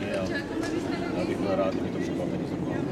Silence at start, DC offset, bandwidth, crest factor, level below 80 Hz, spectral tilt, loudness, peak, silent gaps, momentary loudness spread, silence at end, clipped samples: 0 s; under 0.1%; 13.5 kHz; 16 dB; -52 dBFS; -6.5 dB/octave; -29 LUFS; -14 dBFS; none; 4 LU; 0 s; under 0.1%